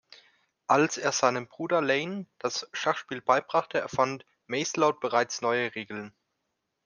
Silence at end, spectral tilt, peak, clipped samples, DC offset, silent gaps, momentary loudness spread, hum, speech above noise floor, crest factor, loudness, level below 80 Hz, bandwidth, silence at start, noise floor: 0.75 s; -3.5 dB/octave; -8 dBFS; under 0.1%; under 0.1%; none; 11 LU; none; 53 dB; 22 dB; -28 LUFS; -76 dBFS; 10.5 kHz; 0.7 s; -81 dBFS